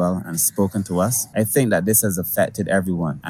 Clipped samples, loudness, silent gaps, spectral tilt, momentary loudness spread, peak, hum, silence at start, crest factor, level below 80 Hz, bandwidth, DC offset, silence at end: under 0.1%; -19 LUFS; none; -5 dB/octave; 5 LU; -4 dBFS; none; 0 s; 16 dB; -52 dBFS; 17.5 kHz; under 0.1%; 0 s